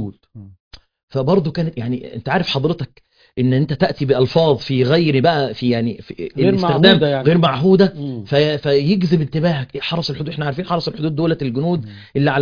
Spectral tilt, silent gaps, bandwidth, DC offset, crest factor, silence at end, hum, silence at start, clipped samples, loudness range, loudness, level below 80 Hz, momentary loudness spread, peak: -8 dB/octave; 0.60-0.71 s, 1.03-1.08 s; 5.2 kHz; under 0.1%; 16 dB; 0 s; none; 0 s; under 0.1%; 5 LU; -17 LUFS; -48 dBFS; 11 LU; 0 dBFS